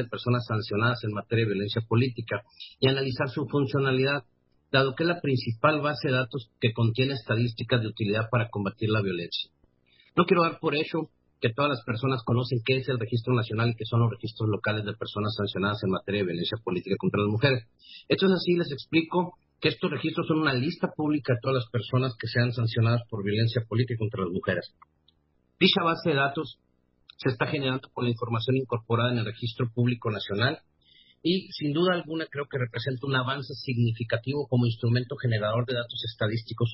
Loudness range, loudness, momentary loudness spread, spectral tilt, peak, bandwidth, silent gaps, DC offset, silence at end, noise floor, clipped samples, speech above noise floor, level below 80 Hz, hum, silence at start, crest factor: 2 LU; -27 LUFS; 7 LU; -10.5 dB/octave; -6 dBFS; 5.8 kHz; none; under 0.1%; 0 s; -69 dBFS; under 0.1%; 42 dB; -58 dBFS; none; 0 s; 20 dB